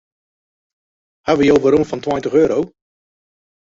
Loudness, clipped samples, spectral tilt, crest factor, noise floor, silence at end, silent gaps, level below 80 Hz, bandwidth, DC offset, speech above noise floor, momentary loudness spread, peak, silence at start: -15 LUFS; under 0.1%; -6.5 dB/octave; 16 dB; under -90 dBFS; 1.1 s; none; -50 dBFS; 7.8 kHz; under 0.1%; over 75 dB; 11 LU; -2 dBFS; 1.25 s